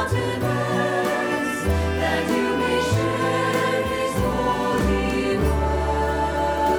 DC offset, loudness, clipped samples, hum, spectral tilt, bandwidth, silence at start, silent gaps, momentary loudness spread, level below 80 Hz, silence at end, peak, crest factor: under 0.1%; -22 LUFS; under 0.1%; none; -5.5 dB/octave; over 20 kHz; 0 s; none; 2 LU; -32 dBFS; 0 s; -8 dBFS; 12 dB